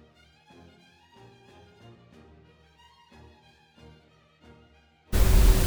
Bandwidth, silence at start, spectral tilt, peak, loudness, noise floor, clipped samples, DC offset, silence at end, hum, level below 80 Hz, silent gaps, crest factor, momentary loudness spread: over 20 kHz; 5.1 s; -5 dB/octave; -8 dBFS; -24 LUFS; -59 dBFS; under 0.1%; under 0.1%; 0 s; none; -30 dBFS; none; 20 dB; 32 LU